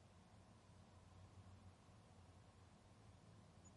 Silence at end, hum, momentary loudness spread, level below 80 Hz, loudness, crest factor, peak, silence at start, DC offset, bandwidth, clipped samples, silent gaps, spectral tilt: 0 s; none; 3 LU; -78 dBFS; -67 LUFS; 14 dB; -52 dBFS; 0 s; under 0.1%; 11 kHz; under 0.1%; none; -5.5 dB/octave